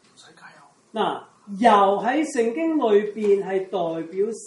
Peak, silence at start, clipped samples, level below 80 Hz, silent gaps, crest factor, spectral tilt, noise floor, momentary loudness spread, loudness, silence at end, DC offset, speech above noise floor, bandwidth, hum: -2 dBFS; 0.45 s; under 0.1%; -78 dBFS; none; 20 dB; -5 dB/octave; -49 dBFS; 10 LU; -21 LUFS; 0 s; under 0.1%; 28 dB; 11.5 kHz; none